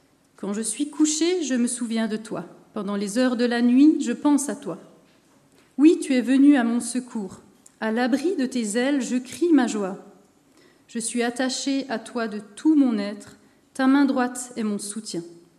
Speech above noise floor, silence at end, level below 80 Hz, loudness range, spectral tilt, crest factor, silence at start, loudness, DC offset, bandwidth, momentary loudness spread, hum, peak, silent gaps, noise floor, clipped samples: 35 dB; 0.25 s; -74 dBFS; 4 LU; -4 dB/octave; 18 dB; 0.4 s; -23 LUFS; under 0.1%; 13 kHz; 16 LU; none; -6 dBFS; none; -58 dBFS; under 0.1%